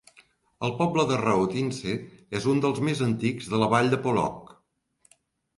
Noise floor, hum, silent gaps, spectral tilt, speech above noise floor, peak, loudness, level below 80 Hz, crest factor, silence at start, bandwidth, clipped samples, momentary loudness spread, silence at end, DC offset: -69 dBFS; none; none; -6 dB/octave; 44 dB; -8 dBFS; -26 LUFS; -58 dBFS; 20 dB; 0.6 s; 11.5 kHz; under 0.1%; 10 LU; 1.1 s; under 0.1%